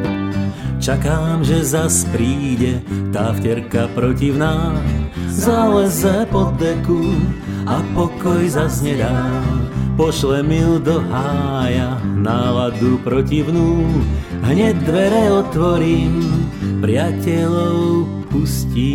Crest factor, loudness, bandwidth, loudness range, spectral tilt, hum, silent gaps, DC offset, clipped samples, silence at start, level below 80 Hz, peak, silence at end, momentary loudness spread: 16 dB; -17 LUFS; 16.5 kHz; 2 LU; -6 dB/octave; none; none; under 0.1%; under 0.1%; 0 s; -28 dBFS; 0 dBFS; 0 s; 5 LU